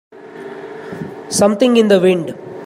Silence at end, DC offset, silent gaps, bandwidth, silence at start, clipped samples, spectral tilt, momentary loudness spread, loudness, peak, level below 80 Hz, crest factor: 0 s; under 0.1%; none; 15 kHz; 0.15 s; under 0.1%; -5 dB/octave; 20 LU; -13 LUFS; 0 dBFS; -60 dBFS; 16 dB